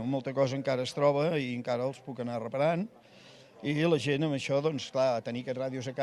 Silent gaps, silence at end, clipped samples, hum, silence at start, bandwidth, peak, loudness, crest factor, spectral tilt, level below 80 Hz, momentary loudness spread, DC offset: none; 0 s; under 0.1%; none; 0 s; 12 kHz; -12 dBFS; -31 LUFS; 18 dB; -6 dB/octave; -74 dBFS; 9 LU; under 0.1%